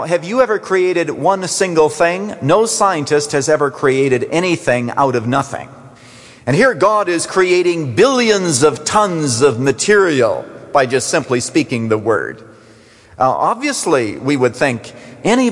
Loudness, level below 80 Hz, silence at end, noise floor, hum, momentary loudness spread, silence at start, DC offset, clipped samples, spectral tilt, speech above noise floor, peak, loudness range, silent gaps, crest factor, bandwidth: -15 LUFS; -54 dBFS; 0 s; -44 dBFS; none; 6 LU; 0 s; under 0.1%; under 0.1%; -4.5 dB/octave; 30 dB; -2 dBFS; 4 LU; none; 14 dB; 11.5 kHz